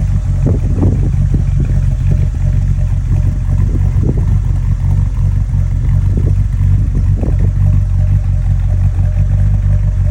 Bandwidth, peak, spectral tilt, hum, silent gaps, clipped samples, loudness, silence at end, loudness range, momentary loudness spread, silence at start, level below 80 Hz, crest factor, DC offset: 7.6 kHz; -2 dBFS; -9.5 dB/octave; none; none; under 0.1%; -14 LUFS; 0 s; 1 LU; 2 LU; 0 s; -14 dBFS; 10 dB; 0.6%